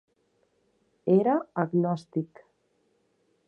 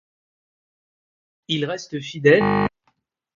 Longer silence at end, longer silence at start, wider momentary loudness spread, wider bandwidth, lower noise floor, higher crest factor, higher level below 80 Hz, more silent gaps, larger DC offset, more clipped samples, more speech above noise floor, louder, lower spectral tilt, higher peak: first, 1.2 s vs 0.7 s; second, 1.05 s vs 1.5 s; about the same, 12 LU vs 12 LU; first, 8.8 kHz vs 7.4 kHz; about the same, -71 dBFS vs -69 dBFS; about the same, 20 dB vs 22 dB; second, -76 dBFS vs -54 dBFS; neither; neither; neither; second, 45 dB vs 49 dB; second, -27 LUFS vs -20 LUFS; first, -9.5 dB/octave vs -6 dB/octave; second, -10 dBFS vs -2 dBFS